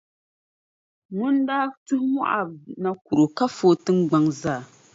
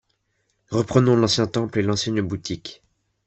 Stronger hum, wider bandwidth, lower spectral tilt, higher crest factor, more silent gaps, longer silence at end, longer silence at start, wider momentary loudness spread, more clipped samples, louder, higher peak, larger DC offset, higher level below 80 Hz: neither; about the same, 7.8 kHz vs 8.4 kHz; about the same, -6.5 dB/octave vs -5.5 dB/octave; about the same, 16 dB vs 20 dB; first, 1.77-1.86 s, 3.01-3.05 s vs none; second, 0.3 s vs 0.55 s; first, 1.1 s vs 0.7 s; second, 10 LU vs 13 LU; neither; about the same, -23 LUFS vs -21 LUFS; about the same, -6 dBFS vs -4 dBFS; neither; second, -64 dBFS vs -54 dBFS